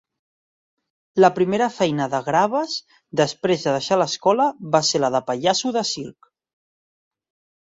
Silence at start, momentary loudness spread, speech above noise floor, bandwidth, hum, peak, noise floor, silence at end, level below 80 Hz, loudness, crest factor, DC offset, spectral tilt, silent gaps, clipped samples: 1.15 s; 10 LU; over 70 dB; 7.8 kHz; none; -2 dBFS; under -90 dBFS; 1.55 s; -64 dBFS; -20 LUFS; 20 dB; under 0.1%; -4 dB/octave; none; under 0.1%